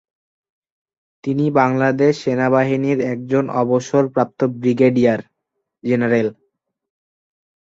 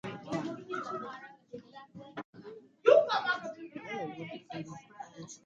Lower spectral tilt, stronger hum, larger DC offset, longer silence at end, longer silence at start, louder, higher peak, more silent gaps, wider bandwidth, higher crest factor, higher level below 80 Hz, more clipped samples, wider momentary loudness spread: first, -7.5 dB/octave vs -5 dB/octave; neither; neither; first, 1.35 s vs 0.1 s; first, 1.25 s vs 0.05 s; first, -17 LUFS vs -32 LUFS; first, -2 dBFS vs -10 dBFS; second, none vs 2.25-2.33 s; about the same, 7.8 kHz vs 7.8 kHz; second, 18 dB vs 24 dB; first, -60 dBFS vs -78 dBFS; neither; second, 6 LU vs 25 LU